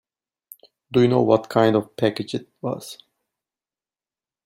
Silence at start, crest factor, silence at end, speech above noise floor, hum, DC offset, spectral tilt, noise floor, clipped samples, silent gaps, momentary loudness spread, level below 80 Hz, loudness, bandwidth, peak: 0.9 s; 20 dB; 1.5 s; over 70 dB; none; under 0.1%; -7 dB/octave; under -90 dBFS; under 0.1%; none; 13 LU; -62 dBFS; -21 LUFS; 16 kHz; -4 dBFS